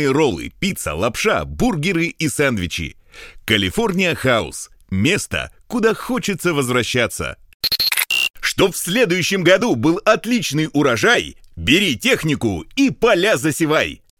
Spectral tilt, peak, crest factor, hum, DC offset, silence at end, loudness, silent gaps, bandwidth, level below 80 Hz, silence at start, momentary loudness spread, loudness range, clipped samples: -4 dB/octave; 0 dBFS; 18 dB; none; under 0.1%; 0.25 s; -17 LUFS; 7.54-7.60 s, 8.30-8.34 s; 18.5 kHz; -42 dBFS; 0 s; 9 LU; 4 LU; under 0.1%